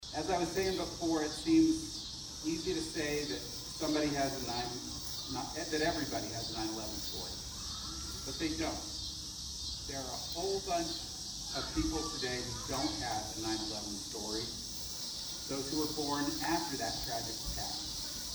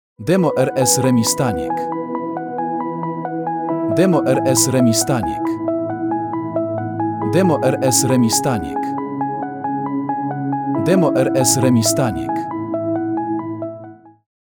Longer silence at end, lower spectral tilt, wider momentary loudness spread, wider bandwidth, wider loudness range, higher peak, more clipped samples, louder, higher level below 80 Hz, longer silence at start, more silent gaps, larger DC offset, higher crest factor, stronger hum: second, 0 s vs 0.35 s; second, -3 dB/octave vs -5 dB/octave; second, 6 LU vs 10 LU; about the same, over 20 kHz vs over 20 kHz; about the same, 4 LU vs 2 LU; second, -18 dBFS vs -2 dBFS; neither; second, -36 LUFS vs -18 LUFS; about the same, -52 dBFS vs -52 dBFS; second, 0 s vs 0.2 s; neither; neither; about the same, 18 dB vs 16 dB; neither